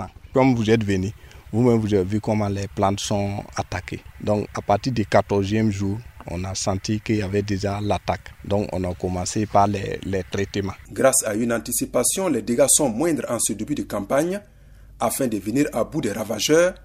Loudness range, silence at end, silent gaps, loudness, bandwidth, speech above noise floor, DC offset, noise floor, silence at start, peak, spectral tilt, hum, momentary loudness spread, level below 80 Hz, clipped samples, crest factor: 4 LU; 0 s; none; -22 LUFS; 16 kHz; 24 dB; under 0.1%; -46 dBFS; 0 s; -2 dBFS; -4.5 dB/octave; none; 10 LU; -46 dBFS; under 0.1%; 20 dB